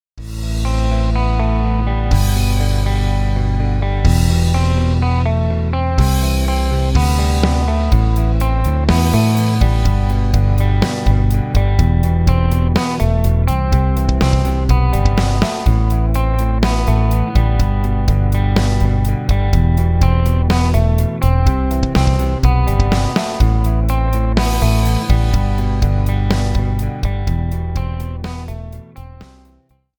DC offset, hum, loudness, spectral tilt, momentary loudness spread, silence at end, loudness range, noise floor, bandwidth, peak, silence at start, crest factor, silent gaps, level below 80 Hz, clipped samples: under 0.1%; none; -16 LUFS; -6.5 dB/octave; 4 LU; 0.75 s; 2 LU; -54 dBFS; over 20 kHz; 0 dBFS; 0.15 s; 14 dB; none; -16 dBFS; under 0.1%